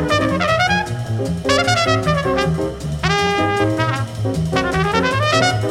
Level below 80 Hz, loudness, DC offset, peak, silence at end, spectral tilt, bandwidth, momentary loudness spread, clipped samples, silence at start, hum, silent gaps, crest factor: -36 dBFS; -17 LUFS; under 0.1%; 0 dBFS; 0 s; -5 dB/octave; 15.5 kHz; 7 LU; under 0.1%; 0 s; none; none; 16 dB